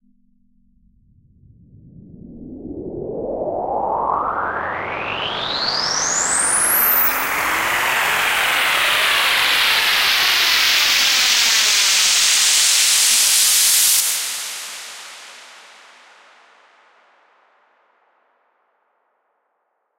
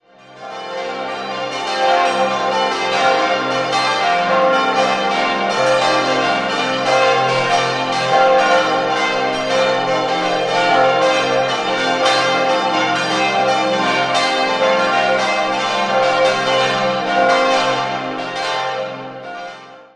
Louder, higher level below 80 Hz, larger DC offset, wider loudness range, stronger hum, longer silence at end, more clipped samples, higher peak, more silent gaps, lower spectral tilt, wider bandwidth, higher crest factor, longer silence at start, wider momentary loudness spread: about the same, -14 LUFS vs -16 LUFS; first, -52 dBFS vs -58 dBFS; neither; first, 15 LU vs 2 LU; neither; first, 4.4 s vs 0.15 s; neither; about the same, -2 dBFS vs -2 dBFS; neither; second, 1 dB/octave vs -3 dB/octave; first, 16 kHz vs 11.5 kHz; about the same, 18 dB vs 16 dB; first, 2.15 s vs 0.3 s; first, 17 LU vs 9 LU